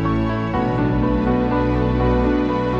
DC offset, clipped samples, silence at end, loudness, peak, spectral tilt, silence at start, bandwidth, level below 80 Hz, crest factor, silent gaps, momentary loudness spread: under 0.1%; under 0.1%; 0 s; -19 LUFS; -6 dBFS; -9 dB/octave; 0 s; 7 kHz; -28 dBFS; 12 dB; none; 3 LU